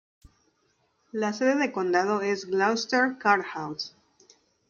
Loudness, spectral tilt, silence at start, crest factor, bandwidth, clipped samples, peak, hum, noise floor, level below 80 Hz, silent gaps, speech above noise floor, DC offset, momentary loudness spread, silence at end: -26 LUFS; -4 dB/octave; 1.15 s; 20 dB; 7.4 kHz; under 0.1%; -6 dBFS; none; -70 dBFS; -68 dBFS; none; 45 dB; under 0.1%; 11 LU; 0.8 s